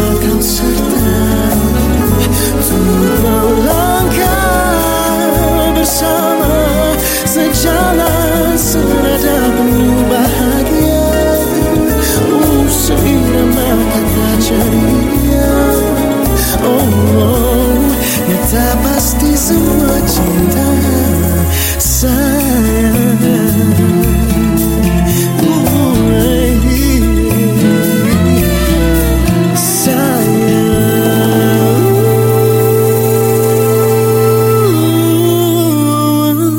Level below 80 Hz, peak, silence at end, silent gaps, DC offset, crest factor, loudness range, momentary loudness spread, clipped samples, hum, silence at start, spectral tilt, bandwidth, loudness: -20 dBFS; 0 dBFS; 0 s; none; under 0.1%; 10 dB; 1 LU; 2 LU; under 0.1%; none; 0 s; -5.5 dB/octave; 17 kHz; -11 LUFS